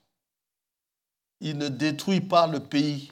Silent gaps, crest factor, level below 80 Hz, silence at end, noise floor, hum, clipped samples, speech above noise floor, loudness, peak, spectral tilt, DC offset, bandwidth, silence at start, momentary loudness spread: none; 20 dB; -78 dBFS; 0.05 s; -88 dBFS; none; under 0.1%; 63 dB; -25 LUFS; -8 dBFS; -6 dB/octave; under 0.1%; 15.5 kHz; 1.4 s; 10 LU